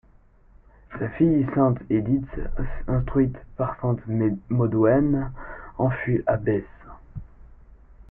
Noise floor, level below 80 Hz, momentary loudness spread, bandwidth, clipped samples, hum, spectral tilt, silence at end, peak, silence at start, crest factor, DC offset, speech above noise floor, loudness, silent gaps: -54 dBFS; -38 dBFS; 18 LU; 3.4 kHz; under 0.1%; none; -13 dB/octave; 0.1 s; -8 dBFS; 0.9 s; 16 dB; under 0.1%; 32 dB; -24 LUFS; none